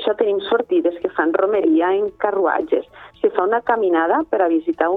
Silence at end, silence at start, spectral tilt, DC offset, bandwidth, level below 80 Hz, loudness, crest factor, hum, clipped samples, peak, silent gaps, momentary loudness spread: 0 s; 0 s; -7.5 dB/octave; under 0.1%; 4 kHz; -60 dBFS; -19 LUFS; 18 dB; none; under 0.1%; 0 dBFS; none; 5 LU